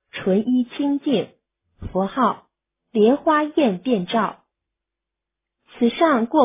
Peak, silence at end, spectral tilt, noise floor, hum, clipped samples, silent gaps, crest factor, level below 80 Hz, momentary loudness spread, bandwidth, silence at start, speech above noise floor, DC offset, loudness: -4 dBFS; 0 s; -10.5 dB/octave; -85 dBFS; none; under 0.1%; none; 18 dB; -52 dBFS; 10 LU; 3.9 kHz; 0.15 s; 66 dB; under 0.1%; -20 LUFS